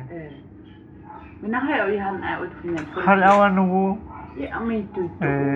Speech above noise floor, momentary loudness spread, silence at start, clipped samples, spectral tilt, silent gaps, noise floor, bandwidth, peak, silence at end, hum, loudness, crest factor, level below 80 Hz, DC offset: 23 dB; 22 LU; 0 s; under 0.1%; -7.5 dB/octave; none; -44 dBFS; 7.8 kHz; -2 dBFS; 0 s; none; -21 LUFS; 20 dB; -50 dBFS; under 0.1%